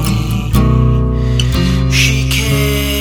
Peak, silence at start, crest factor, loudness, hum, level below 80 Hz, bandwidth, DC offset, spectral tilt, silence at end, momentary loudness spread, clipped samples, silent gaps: 0 dBFS; 0 s; 12 dB; -13 LUFS; none; -18 dBFS; over 20 kHz; under 0.1%; -5 dB/octave; 0 s; 4 LU; under 0.1%; none